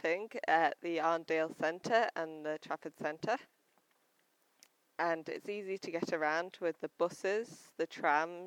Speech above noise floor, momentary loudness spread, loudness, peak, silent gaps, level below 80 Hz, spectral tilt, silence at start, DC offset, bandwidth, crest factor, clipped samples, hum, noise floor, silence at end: 40 dB; 9 LU; -36 LUFS; -16 dBFS; none; -90 dBFS; -4.5 dB/octave; 0.05 s; under 0.1%; 16.5 kHz; 20 dB; under 0.1%; none; -75 dBFS; 0 s